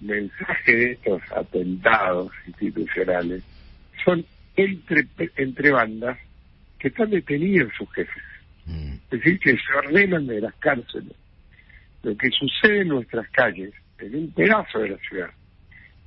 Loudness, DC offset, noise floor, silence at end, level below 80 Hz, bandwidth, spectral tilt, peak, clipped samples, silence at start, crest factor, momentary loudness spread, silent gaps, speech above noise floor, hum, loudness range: -22 LUFS; under 0.1%; -51 dBFS; 0.75 s; -48 dBFS; 5.8 kHz; -10.5 dB/octave; -2 dBFS; under 0.1%; 0 s; 22 dB; 16 LU; none; 29 dB; none; 3 LU